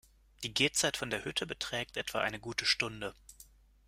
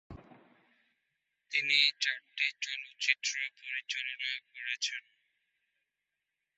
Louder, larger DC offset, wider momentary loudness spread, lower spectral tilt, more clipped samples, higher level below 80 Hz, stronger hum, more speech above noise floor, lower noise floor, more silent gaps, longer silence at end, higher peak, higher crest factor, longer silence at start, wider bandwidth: about the same, -33 LUFS vs -32 LUFS; neither; second, 8 LU vs 13 LU; first, -2 dB/octave vs 3.5 dB/octave; neither; first, -62 dBFS vs -72 dBFS; neither; second, 25 dB vs 53 dB; second, -60 dBFS vs -87 dBFS; neither; second, 0.45 s vs 1.6 s; about the same, -12 dBFS vs -10 dBFS; about the same, 24 dB vs 26 dB; first, 0.4 s vs 0.1 s; first, 16 kHz vs 8 kHz